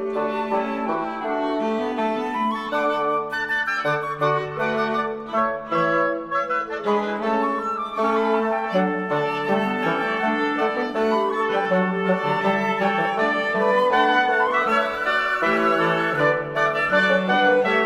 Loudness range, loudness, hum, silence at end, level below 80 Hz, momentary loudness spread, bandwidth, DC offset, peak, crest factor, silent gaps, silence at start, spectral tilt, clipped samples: 4 LU; -21 LUFS; none; 0 s; -58 dBFS; 6 LU; 13 kHz; under 0.1%; -6 dBFS; 16 dB; none; 0 s; -6 dB/octave; under 0.1%